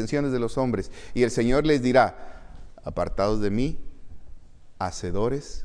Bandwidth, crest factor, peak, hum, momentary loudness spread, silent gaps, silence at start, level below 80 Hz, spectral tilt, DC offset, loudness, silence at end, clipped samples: 10.5 kHz; 18 dB; -6 dBFS; none; 13 LU; none; 0 s; -38 dBFS; -6 dB/octave; under 0.1%; -25 LUFS; 0 s; under 0.1%